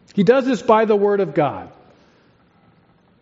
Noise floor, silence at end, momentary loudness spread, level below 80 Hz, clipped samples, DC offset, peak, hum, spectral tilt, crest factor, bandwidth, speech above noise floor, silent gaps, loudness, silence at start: -56 dBFS; 1.55 s; 7 LU; -64 dBFS; under 0.1%; under 0.1%; -2 dBFS; none; -5.5 dB/octave; 18 dB; 7.8 kHz; 39 dB; none; -17 LUFS; 0.15 s